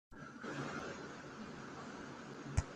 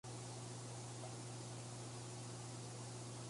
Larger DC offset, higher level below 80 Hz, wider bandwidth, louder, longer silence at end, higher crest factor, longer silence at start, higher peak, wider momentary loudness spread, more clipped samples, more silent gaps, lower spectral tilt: neither; first, -56 dBFS vs -76 dBFS; about the same, 11.5 kHz vs 11.5 kHz; first, -47 LUFS vs -50 LUFS; about the same, 0 s vs 0 s; first, 26 dB vs 12 dB; about the same, 0.1 s vs 0.05 s; first, -18 dBFS vs -38 dBFS; first, 8 LU vs 0 LU; neither; neither; first, -5.5 dB/octave vs -4 dB/octave